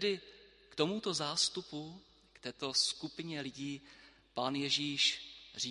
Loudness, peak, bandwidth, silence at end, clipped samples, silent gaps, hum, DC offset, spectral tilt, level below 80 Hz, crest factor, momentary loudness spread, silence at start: -35 LUFS; -16 dBFS; 11.5 kHz; 0 s; under 0.1%; none; none; under 0.1%; -2.5 dB/octave; -74 dBFS; 22 dB; 16 LU; 0 s